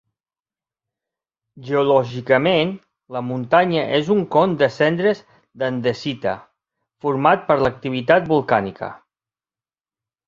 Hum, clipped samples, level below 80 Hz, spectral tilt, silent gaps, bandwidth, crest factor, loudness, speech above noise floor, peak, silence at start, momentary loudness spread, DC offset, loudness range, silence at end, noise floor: none; under 0.1%; -56 dBFS; -7 dB/octave; none; 7.4 kHz; 20 dB; -19 LUFS; over 72 dB; 0 dBFS; 1.55 s; 12 LU; under 0.1%; 3 LU; 1.3 s; under -90 dBFS